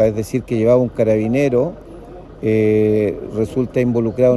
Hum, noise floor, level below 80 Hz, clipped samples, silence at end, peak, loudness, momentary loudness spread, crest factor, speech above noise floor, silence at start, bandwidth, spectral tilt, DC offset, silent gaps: none; -36 dBFS; -42 dBFS; under 0.1%; 0 s; -2 dBFS; -17 LUFS; 11 LU; 14 dB; 20 dB; 0 s; 12.5 kHz; -8.5 dB/octave; under 0.1%; none